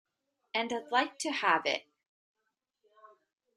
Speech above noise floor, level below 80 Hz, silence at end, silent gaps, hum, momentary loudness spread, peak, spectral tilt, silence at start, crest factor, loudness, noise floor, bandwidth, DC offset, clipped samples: 53 dB; -86 dBFS; 1.75 s; none; none; 7 LU; -12 dBFS; -1.5 dB/octave; 0.55 s; 24 dB; -31 LUFS; -84 dBFS; 12.5 kHz; under 0.1%; under 0.1%